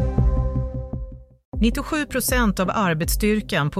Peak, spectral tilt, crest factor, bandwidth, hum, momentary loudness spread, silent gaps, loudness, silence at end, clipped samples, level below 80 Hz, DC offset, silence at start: -6 dBFS; -5 dB/octave; 16 dB; 16 kHz; none; 13 LU; 1.45-1.52 s; -22 LUFS; 0 s; under 0.1%; -28 dBFS; under 0.1%; 0 s